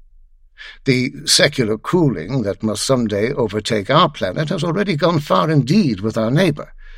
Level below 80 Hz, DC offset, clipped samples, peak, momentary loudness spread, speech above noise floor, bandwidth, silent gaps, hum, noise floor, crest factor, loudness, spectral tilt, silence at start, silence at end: -44 dBFS; under 0.1%; under 0.1%; 0 dBFS; 6 LU; 30 dB; 16 kHz; none; none; -47 dBFS; 18 dB; -17 LUFS; -5 dB/octave; 0.6 s; 0 s